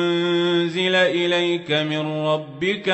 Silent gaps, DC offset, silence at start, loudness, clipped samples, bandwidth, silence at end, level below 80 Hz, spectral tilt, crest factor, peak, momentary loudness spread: none; under 0.1%; 0 s; -20 LUFS; under 0.1%; 8.4 kHz; 0 s; -68 dBFS; -5.5 dB/octave; 14 dB; -8 dBFS; 6 LU